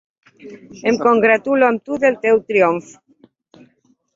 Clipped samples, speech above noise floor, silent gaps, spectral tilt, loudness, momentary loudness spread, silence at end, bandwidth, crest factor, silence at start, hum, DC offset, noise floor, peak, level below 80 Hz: under 0.1%; 43 dB; none; -5.5 dB/octave; -16 LUFS; 8 LU; 1.35 s; 7.6 kHz; 16 dB; 0.45 s; none; under 0.1%; -59 dBFS; -2 dBFS; -62 dBFS